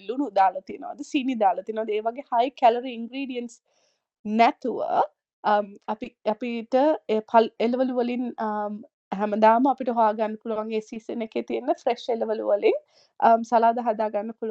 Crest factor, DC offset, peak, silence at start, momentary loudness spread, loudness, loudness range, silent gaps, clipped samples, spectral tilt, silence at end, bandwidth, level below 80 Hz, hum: 20 dB; under 0.1%; -4 dBFS; 0.05 s; 12 LU; -24 LUFS; 3 LU; 4.19-4.24 s, 5.33-5.43 s, 8.93-9.11 s; under 0.1%; -6 dB/octave; 0 s; 8.2 kHz; -76 dBFS; none